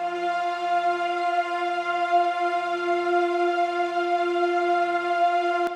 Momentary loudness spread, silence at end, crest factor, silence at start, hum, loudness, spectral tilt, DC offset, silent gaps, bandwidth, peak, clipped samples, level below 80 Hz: 4 LU; 0 s; 12 dB; 0 s; none; -24 LUFS; -3.5 dB/octave; under 0.1%; none; 10 kHz; -12 dBFS; under 0.1%; -74 dBFS